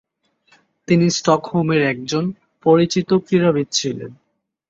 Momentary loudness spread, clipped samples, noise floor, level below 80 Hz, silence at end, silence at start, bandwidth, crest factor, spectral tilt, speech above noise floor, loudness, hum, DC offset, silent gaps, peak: 9 LU; under 0.1%; -60 dBFS; -58 dBFS; 0.55 s; 0.9 s; 7.8 kHz; 16 dB; -5.5 dB/octave; 42 dB; -18 LUFS; none; under 0.1%; none; -2 dBFS